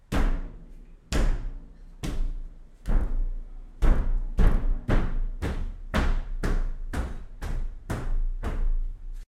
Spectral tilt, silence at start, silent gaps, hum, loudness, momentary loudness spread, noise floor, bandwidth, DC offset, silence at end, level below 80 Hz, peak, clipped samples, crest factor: -6.5 dB/octave; 0.1 s; none; none; -32 LUFS; 16 LU; -45 dBFS; 10 kHz; under 0.1%; 0.05 s; -26 dBFS; -8 dBFS; under 0.1%; 18 dB